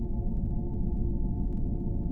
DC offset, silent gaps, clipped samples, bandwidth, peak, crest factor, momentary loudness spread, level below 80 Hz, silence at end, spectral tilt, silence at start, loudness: under 0.1%; none; under 0.1%; 1.1 kHz; -18 dBFS; 10 dB; 1 LU; -30 dBFS; 0 s; -13.5 dB/octave; 0 s; -33 LUFS